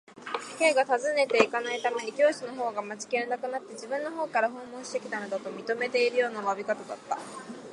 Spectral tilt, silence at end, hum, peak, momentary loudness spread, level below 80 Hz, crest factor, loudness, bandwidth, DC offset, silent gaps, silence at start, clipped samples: -2.5 dB/octave; 0 s; none; -4 dBFS; 11 LU; -80 dBFS; 24 dB; -29 LUFS; 11.5 kHz; under 0.1%; none; 0.1 s; under 0.1%